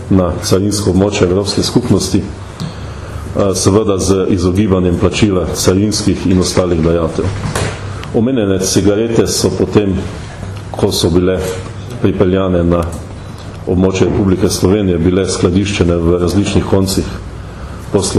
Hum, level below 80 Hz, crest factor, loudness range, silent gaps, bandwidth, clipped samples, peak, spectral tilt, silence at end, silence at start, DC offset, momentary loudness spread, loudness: none; -30 dBFS; 12 dB; 2 LU; none; 14 kHz; under 0.1%; 0 dBFS; -5.5 dB/octave; 0 s; 0 s; under 0.1%; 13 LU; -13 LUFS